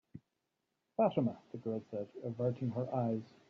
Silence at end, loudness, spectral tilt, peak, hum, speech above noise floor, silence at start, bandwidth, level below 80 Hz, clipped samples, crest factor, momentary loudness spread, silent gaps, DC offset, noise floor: 0.25 s; -37 LUFS; -9 dB/octave; -18 dBFS; none; 49 dB; 0.15 s; 6.6 kHz; -78 dBFS; under 0.1%; 20 dB; 11 LU; none; under 0.1%; -86 dBFS